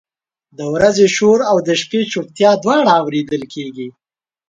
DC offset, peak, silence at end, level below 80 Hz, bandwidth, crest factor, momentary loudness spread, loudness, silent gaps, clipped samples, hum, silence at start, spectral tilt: under 0.1%; 0 dBFS; 0.6 s; -54 dBFS; 9.2 kHz; 16 dB; 16 LU; -14 LUFS; none; under 0.1%; none; 0.6 s; -4.5 dB/octave